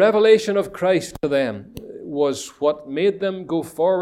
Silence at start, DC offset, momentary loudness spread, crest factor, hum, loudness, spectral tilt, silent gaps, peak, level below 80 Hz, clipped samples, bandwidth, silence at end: 0 s; under 0.1%; 13 LU; 16 dB; none; -21 LUFS; -5 dB/octave; none; -2 dBFS; -56 dBFS; under 0.1%; 14 kHz; 0 s